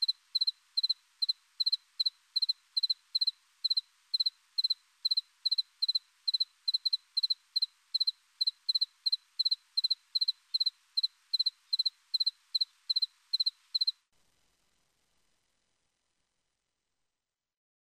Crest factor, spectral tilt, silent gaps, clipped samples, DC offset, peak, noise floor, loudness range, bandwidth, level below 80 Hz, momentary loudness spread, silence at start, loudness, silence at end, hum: 16 dB; 5.5 dB/octave; none; under 0.1%; under 0.1%; -20 dBFS; under -90 dBFS; 3 LU; 15 kHz; under -90 dBFS; 2 LU; 0 s; -31 LUFS; 4.1 s; none